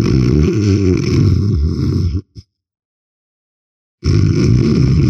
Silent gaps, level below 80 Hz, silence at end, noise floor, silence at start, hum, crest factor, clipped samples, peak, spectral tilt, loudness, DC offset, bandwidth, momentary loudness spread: 2.85-3.98 s; -24 dBFS; 0 s; -40 dBFS; 0 s; none; 12 dB; under 0.1%; -2 dBFS; -8 dB/octave; -14 LUFS; under 0.1%; 7.6 kHz; 6 LU